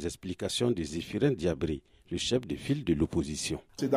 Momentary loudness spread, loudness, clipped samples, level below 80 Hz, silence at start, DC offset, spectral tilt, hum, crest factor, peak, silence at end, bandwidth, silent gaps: 7 LU; -32 LUFS; under 0.1%; -50 dBFS; 0 s; under 0.1%; -5 dB/octave; none; 18 dB; -14 dBFS; 0 s; 15.5 kHz; none